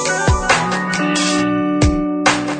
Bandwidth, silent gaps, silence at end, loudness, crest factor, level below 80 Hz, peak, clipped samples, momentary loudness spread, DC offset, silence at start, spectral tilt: 9.4 kHz; none; 0 s; -16 LUFS; 16 dB; -28 dBFS; 0 dBFS; under 0.1%; 2 LU; under 0.1%; 0 s; -4 dB/octave